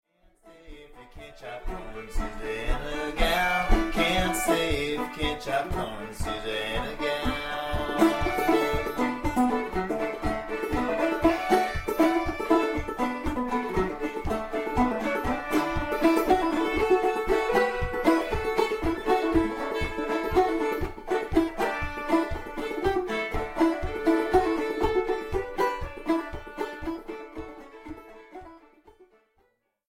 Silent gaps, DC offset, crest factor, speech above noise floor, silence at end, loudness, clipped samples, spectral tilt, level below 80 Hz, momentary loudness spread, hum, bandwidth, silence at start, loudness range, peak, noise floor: none; under 0.1%; 20 dB; 40 dB; 1.3 s; -27 LUFS; under 0.1%; -5 dB/octave; -38 dBFS; 12 LU; none; 16 kHz; 0.45 s; 6 LU; -6 dBFS; -70 dBFS